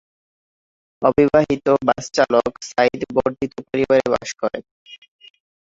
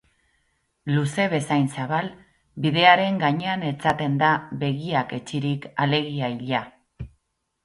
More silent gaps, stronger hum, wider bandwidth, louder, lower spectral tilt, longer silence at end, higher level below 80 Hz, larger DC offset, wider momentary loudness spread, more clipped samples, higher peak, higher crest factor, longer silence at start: first, 4.71-4.85 s vs none; neither; second, 7.8 kHz vs 11.5 kHz; first, -19 LUFS vs -23 LUFS; about the same, -5 dB/octave vs -6 dB/octave; about the same, 0.65 s vs 0.55 s; first, -50 dBFS vs -56 dBFS; neither; second, 10 LU vs 18 LU; neither; about the same, 0 dBFS vs 0 dBFS; about the same, 20 dB vs 24 dB; first, 1 s vs 0.85 s